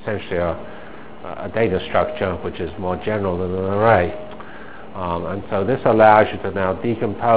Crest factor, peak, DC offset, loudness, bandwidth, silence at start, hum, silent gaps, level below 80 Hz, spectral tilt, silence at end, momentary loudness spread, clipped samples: 20 dB; 0 dBFS; 2%; -19 LUFS; 4 kHz; 0 s; none; none; -40 dBFS; -10.5 dB/octave; 0 s; 21 LU; under 0.1%